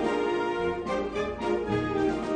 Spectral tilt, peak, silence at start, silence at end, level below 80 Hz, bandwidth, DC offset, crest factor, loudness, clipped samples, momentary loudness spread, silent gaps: -6.5 dB/octave; -16 dBFS; 0 s; 0 s; -50 dBFS; 9.8 kHz; under 0.1%; 12 dB; -29 LUFS; under 0.1%; 3 LU; none